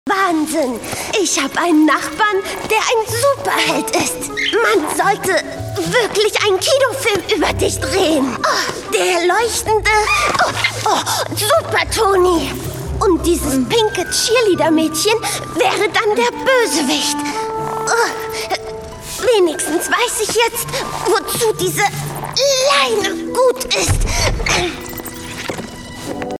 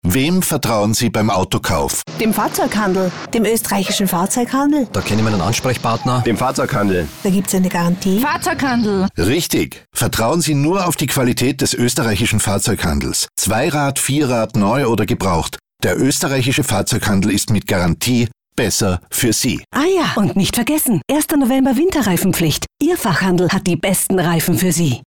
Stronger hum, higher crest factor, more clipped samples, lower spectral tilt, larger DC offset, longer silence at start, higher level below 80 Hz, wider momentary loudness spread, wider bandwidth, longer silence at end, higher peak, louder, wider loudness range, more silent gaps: neither; first, 16 dB vs 10 dB; neither; second, -3 dB/octave vs -4.5 dB/octave; second, under 0.1% vs 0.7%; about the same, 0.05 s vs 0.05 s; about the same, -34 dBFS vs -38 dBFS; first, 9 LU vs 3 LU; about the same, 18 kHz vs 19.5 kHz; about the same, 0 s vs 0 s; first, 0 dBFS vs -6 dBFS; about the same, -15 LUFS vs -16 LUFS; about the same, 2 LU vs 1 LU; neither